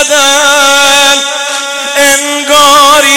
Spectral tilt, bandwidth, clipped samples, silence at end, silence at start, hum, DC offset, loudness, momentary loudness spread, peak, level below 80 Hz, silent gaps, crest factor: 1 dB/octave; over 20 kHz; 2%; 0 s; 0 s; none; under 0.1%; -5 LUFS; 9 LU; 0 dBFS; -44 dBFS; none; 6 dB